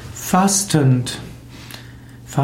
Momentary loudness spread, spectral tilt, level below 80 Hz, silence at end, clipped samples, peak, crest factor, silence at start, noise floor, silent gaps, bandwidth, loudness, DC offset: 21 LU; -4.5 dB/octave; -46 dBFS; 0 s; under 0.1%; -4 dBFS; 16 dB; 0 s; -38 dBFS; none; 16.5 kHz; -17 LUFS; under 0.1%